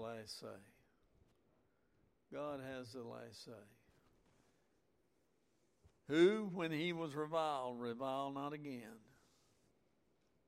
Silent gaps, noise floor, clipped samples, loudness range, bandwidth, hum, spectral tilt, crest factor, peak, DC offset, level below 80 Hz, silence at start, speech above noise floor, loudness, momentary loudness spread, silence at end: none; -80 dBFS; under 0.1%; 14 LU; 14.5 kHz; none; -6 dB/octave; 24 dB; -22 dBFS; under 0.1%; -82 dBFS; 0 s; 39 dB; -41 LUFS; 21 LU; 1.5 s